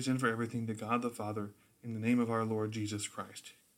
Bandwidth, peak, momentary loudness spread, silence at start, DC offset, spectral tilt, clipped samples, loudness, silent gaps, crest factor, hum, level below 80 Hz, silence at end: 16 kHz; -18 dBFS; 14 LU; 0 s; under 0.1%; -5.5 dB/octave; under 0.1%; -36 LUFS; none; 18 dB; none; -78 dBFS; 0.25 s